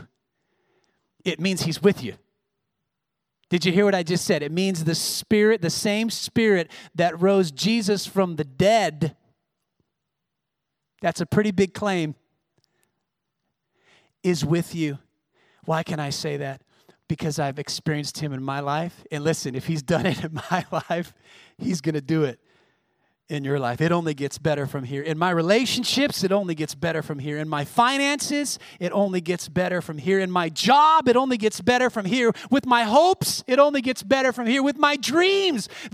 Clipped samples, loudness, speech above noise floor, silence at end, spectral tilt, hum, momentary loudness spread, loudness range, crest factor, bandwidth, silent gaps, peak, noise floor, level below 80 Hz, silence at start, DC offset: under 0.1%; -23 LUFS; 60 dB; 0.05 s; -4.5 dB/octave; none; 10 LU; 8 LU; 20 dB; 16 kHz; none; -4 dBFS; -82 dBFS; -62 dBFS; 0 s; under 0.1%